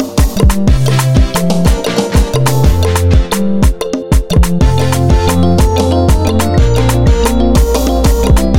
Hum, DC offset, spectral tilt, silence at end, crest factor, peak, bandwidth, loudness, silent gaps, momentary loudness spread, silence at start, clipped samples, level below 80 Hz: none; 4%; -6 dB/octave; 0 s; 10 dB; 0 dBFS; 17 kHz; -11 LUFS; none; 2 LU; 0 s; under 0.1%; -14 dBFS